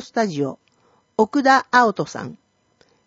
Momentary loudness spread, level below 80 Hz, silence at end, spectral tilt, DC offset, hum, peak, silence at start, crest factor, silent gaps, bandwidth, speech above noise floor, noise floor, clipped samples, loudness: 15 LU; -66 dBFS; 0.75 s; -5 dB/octave; under 0.1%; none; 0 dBFS; 0 s; 20 dB; none; 8 kHz; 42 dB; -61 dBFS; under 0.1%; -19 LUFS